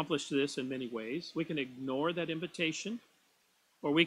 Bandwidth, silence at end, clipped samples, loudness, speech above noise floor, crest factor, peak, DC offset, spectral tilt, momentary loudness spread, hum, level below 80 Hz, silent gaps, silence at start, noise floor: 12 kHz; 0 s; under 0.1%; -36 LUFS; 36 dB; 24 dB; -12 dBFS; under 0.1%; -4.5 dB/octave; 7 LU; none; -76 dBFS; none; 0 s; -72 dBFS